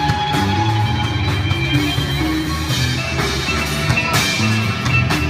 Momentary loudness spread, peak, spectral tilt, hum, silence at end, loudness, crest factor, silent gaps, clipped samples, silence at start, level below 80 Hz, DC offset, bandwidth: 3 LU; -2 dBFS; -4.5 dB/octave; none; 0 s; -17 LUFS; 16 dB; none; under 0.1%; 0 s; -32 dBFS; under 0.1%; 16 kHz